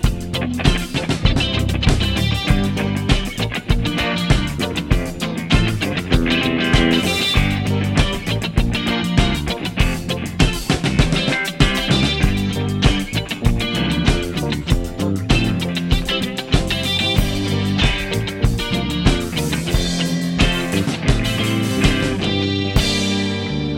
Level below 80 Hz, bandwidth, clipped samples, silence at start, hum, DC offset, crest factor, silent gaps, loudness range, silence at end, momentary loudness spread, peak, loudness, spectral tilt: -24 dBFS; 17 kHz; under 0.1%; 0 s; none; under 0.1%; 18 dB; none; 2 LU; 0 s; 5 LU; 0 dBFS; -18 LUFS; -5 dB/octave